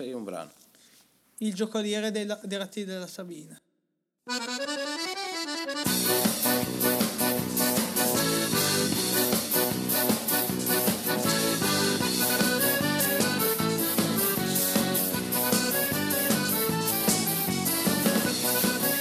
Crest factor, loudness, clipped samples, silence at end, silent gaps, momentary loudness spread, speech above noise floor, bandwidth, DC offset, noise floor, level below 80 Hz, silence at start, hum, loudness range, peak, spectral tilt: 18 dB; -25 LUFS; under 0.1%; 0 s; none; 9 LU; 48 dB; 19 kHz; under 0.1%; -79 dBFS; -62 dBFS; 0 s; none; 9 LU; -10 dBFS; -3 dB/octave